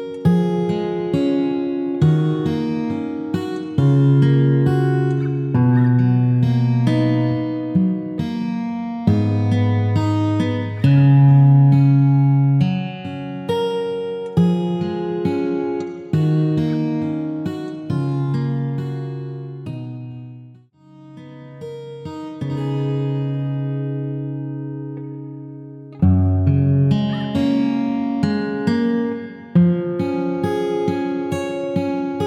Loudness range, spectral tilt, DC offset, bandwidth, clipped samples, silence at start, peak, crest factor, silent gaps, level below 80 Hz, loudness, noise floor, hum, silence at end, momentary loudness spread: 11 LU; -9.5 dB/octave; under 0.1%; 7 kHz; under 0.1%; 0 s; -4 dBFS; 14 dB; none; -50 dBFS; -19 LUFS; -46 dBFS; none; 0 s; 16 LU